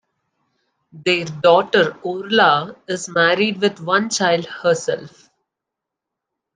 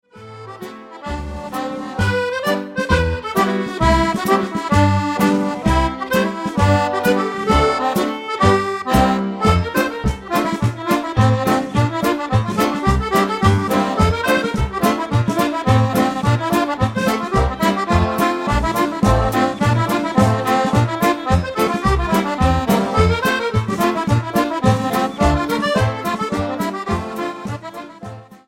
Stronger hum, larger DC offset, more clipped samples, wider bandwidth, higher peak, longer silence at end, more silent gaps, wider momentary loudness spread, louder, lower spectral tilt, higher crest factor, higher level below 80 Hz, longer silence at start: neither; neither; neither; second, 10 kHz vs 17 kHz; about the same, -2 dBFS vs -2 dBFS; first, 1.45 s vs 0.1 s; neither; first, 11 LU vs 7 LU; about the same, -18 LUFS vs -18 LUFS; second, -3.5 dB/octave vs -6 dB/octave; about the same, 18 dB vs 16 dB; second, -66 dBFS vs -30 dBFS; first, 0.95 s vs 0.15 s